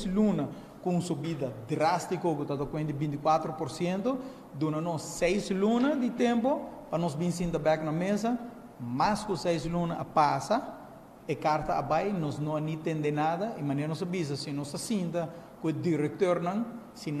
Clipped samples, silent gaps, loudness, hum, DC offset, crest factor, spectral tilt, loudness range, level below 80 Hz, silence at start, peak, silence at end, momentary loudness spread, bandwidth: under 0.1%; none; -30 LUFS; none; under 0.1%; 18 dB; -6.5 dB/octave; 3 LU; -56 dBFS; 0 s; -12 dBFS; 0 s; 9 LU; 14.5 kHz